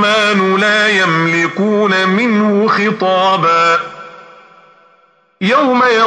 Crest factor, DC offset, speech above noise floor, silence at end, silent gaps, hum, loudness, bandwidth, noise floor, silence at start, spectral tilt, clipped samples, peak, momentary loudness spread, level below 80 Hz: 10 dB; under 0.1%; 40 dB; 0 s; none; none; -12 LUFS; 9.8 kHz; -52 dBFS; 0 s; -5 dB/octave; under 0.1%; -2 dBFS; 4 LU; -68 dBFS